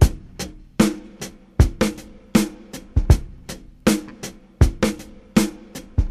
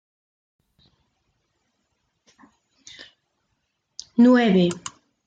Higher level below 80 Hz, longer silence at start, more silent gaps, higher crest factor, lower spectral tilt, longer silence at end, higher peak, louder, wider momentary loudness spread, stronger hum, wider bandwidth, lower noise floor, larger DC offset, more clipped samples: first, -26 dBFS vs -68 dBFS; second, 0 s vs 4.2 s; neither; about the same, 20 dB vs 18 dB; about the same, -6 dB/octave vs -6 dB/octave; second, 0 s vs 0.5 s; first, 0 dBFS vs -6 dBFS; second, -22 LUFS vs -18 LUFS; second, 17 LU vs 27 LU; neither; first, 15 kHz vs 9 kHz; second, -38 dBFS vs -75 dBFS; neither; neither